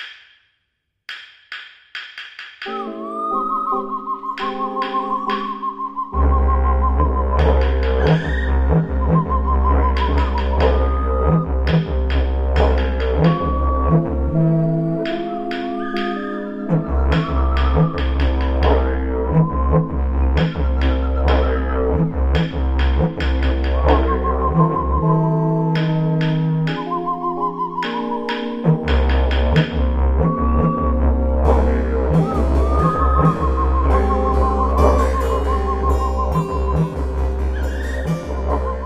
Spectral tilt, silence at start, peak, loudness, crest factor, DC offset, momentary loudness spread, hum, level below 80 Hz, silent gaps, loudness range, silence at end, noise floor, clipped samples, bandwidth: -8.5 dB/octave; 0 s; -2 dBFS; -19 LUFS; 16 dB; under 0.1%; 7 LU; none; -20 dBFS; none; 4 LU; 0 s; -72 dBFS; under 0.1%; 6 kHz